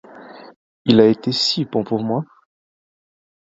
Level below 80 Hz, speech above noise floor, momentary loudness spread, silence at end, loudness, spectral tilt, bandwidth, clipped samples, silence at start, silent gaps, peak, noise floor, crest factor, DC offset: -60 dBFS; 23 dB; 12 LU; 1.15 s; -18 LUFS; -6 dB/octave; 7.8 kHz; under 0.1%; 0.15 s; 0.56-0.85 s; 0 dBFS; -40 dBFS; 20 dB; under 0.1%